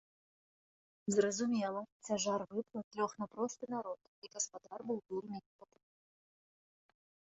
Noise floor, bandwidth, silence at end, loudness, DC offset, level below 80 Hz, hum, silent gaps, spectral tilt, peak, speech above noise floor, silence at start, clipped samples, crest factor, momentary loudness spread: under -90 dBFS; 8 kHz; 1.75 s; -39 LUFS; under 0.1%; -82 dBFS; none; 1.92-2.00 s, 2.84-2.91 s, 4.08-4.22 s, 5.46-5.59 s; -4.5 dB/octave; -18 dBFS; over 51 dB; 1.05 s; under 0.1%; 24 dB; 14 LU